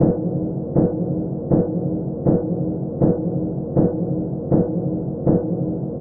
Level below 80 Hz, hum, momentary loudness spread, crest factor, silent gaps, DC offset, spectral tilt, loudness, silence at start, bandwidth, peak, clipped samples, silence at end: -42 dBFS; none; 5 LU; 16 dB; none; under 0.1%; -17 dB/octave; -21 LUFS; 0 s; 2 kHz; -4 dBFS; under 0.1%; 0 s